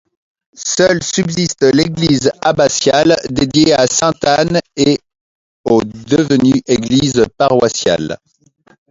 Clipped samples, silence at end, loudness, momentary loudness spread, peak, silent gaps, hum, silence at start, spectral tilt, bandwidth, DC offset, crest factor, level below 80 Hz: under 0.1%; 0.75 s; -13 LUFS; 5 LU; 0 dBFS; 5.21-5.64 s; none; 0.6 s; -4.5 dB/octave; 7.8 kHz; under 0.1%; 14 dB; -44 dBFS